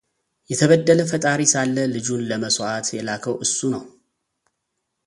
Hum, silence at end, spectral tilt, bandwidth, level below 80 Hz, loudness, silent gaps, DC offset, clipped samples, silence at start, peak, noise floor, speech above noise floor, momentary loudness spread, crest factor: none; 1.2 s; -4 dB/octave; 11.5 kHz; -62 dBFS; -20 LUFS; none; under 0.1%; under 0.1%; 0.5 s; -2 dBFS; -77 dBFS; 57 dB; 10 LU; 20 dB